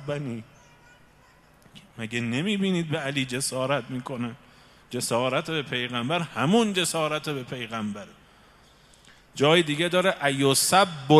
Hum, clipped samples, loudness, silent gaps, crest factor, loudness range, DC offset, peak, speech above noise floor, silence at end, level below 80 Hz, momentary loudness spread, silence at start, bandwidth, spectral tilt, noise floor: none; under 0.1%; -25 LUFS; none; 24 dB; 4 LU; under 0.1%; -2 dBFS; 32 dB; 0 s; -64 dBFS; 14 LU; 0 s; 15.5 kHz; -4 dB/octave; -56 dBFS